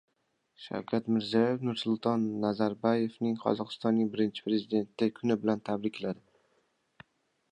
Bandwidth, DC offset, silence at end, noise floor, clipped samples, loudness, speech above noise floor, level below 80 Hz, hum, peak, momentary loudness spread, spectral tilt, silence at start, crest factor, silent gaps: 9.4 kHz; under 0.1%; 1.4 s; -76 dBFS; under 0.1%; -31 LUFS; 46 dB; -74 dBFS; none; -12 dBFS; 7 LU; -7.5 dB/octave; 0.6 s; 20 dB; none